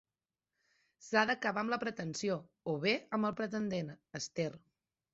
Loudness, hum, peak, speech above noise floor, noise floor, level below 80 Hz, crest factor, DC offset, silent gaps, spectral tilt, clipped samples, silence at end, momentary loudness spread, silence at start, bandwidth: -36 LUFS; none; -14 dBFS; over 54 dB; under -90 dBFS; -76 dBFS; 24 dB; under 0.1%; none; -3.5 dB/octave; under 0.1%; 0.55 s; 9 LU; 1 s; 8 kHz